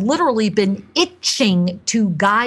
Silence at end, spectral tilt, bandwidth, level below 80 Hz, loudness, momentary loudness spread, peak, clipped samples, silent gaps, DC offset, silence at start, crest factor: 0 s; -4 dB/octave; 12.5 kHz; -58 dBFS; -17 LUFS; 4 LU; -2 dBFS; under 0.1%; none; under 0.1%; 0 s; 14 dB